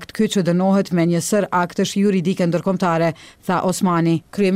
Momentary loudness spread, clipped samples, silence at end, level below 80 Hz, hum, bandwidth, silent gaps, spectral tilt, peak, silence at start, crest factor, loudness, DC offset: 3 LU; under 0.1%; 0 s; -56 dBFS; none; 15.5 kHz; none; -6 dB/octave; -8 dBFS; 0 s; 10 dB; -19 LUFS; under 0.1%